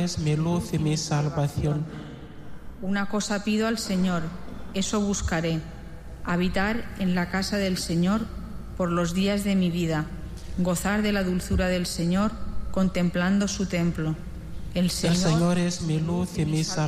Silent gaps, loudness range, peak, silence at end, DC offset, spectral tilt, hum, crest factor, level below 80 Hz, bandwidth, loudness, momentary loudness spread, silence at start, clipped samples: none; 3 LU; -14 dBFS; 0 s; under 0.1%; -5.5 dB/octave; none; 12 dB; -40 dBFS; 15.5 kHz; -26 LUFS; 13 LU; 0 s; under 0.1%